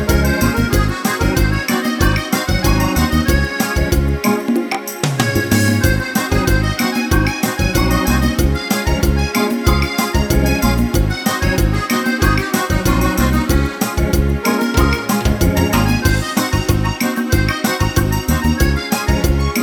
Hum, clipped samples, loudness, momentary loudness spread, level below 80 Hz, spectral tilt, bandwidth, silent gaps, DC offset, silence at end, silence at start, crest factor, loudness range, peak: none; under 0.1%; -16 LUFS; 3 LU; -20 dBFS; -5 dB/octave; 19.5 kHz; none; under 0.1%; 0 s; 0 s; 14 dB; 1 LU; 0 dBFS